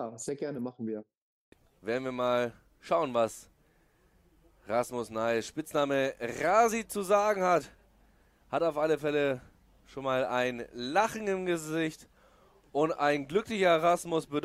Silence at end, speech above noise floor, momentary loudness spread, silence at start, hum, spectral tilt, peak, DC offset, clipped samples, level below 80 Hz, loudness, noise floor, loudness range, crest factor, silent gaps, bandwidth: 0 s; 37 dB; 11 LU; 0 s; none; -4.5 dB/octave; -12 dBFS; under 0.1%; under 0.1%; -64 dBFS; -30 LUFS; -67 dBFS; 5 LU; 20 dB; 1.17-1.52 s; 16 kHz